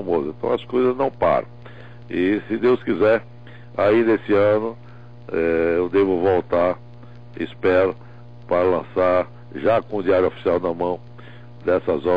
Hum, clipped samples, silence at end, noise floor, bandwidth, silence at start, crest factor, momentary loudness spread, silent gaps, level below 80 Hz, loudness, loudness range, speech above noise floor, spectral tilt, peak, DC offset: 60 Hz at -45 dBFS; under 0.1%; 0 s; -42 dBFS; 5.2 kHz; 0 s; 12 dB; 13 LU; none; -52 dBFS; -20 LUFS; 2 LU; 22 dB; -8.5 dB/octave; -10 dBFS; 0.7%